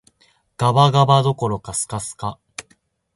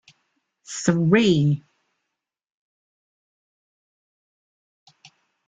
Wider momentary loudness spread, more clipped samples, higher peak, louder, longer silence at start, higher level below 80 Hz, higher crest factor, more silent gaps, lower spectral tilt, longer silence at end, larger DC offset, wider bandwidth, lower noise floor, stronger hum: first, 20 LU vs 12 LU; neither; about the same, -2 dBFS vs -4 dBFS; about the same, -18 LUFS vs -20 LUFS; about the same, 0.6 s vs 0.7 s; first, -50 dBFS vs -62 dBFS; about the same, 18 dB vs 22 dB; neither; about the same, -5.5 dB/octave vs -6 dB/octave; second, 0.55 s vs 3.9 s; neither; first, 11.5 kHz vs 9.4 kHz; second, -61 dBFS vs -85 dBFS; neither